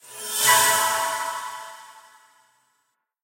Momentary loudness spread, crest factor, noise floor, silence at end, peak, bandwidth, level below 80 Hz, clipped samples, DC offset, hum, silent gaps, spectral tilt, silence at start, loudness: 20 LU; 22 dB; -73 dBFS; 1.25 s; -4 dBFS; 16.5 kHz; -78 dBFS; under 0.1%; under 0.1%; none; none; 1 dB/octave; 0.05 s; -20 LUFS